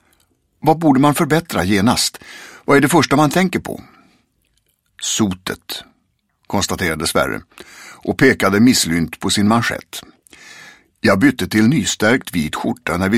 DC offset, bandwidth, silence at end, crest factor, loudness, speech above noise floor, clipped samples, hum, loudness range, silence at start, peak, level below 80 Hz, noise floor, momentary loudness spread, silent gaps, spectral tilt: under 0.1%; 16.5 kHz; 0 s; 18 dB; -16 LUFS; 49 dB; under 0.1%; none; 6 LU; 0.65 s; 0 dBFS; -46 dBFS; -65 dBFS; 16 LU; none; -4.5 dB/octave